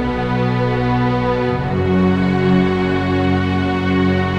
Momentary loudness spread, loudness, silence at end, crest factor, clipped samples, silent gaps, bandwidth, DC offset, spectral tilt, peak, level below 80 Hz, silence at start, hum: 4 LU; -17 LUFS; 0 s; 12 dB; under 0.1%; none; 7.8 kHz; under 0.1%; -8.5 dB/octave; -4 dBFS; -36 dBFS; 0 s; none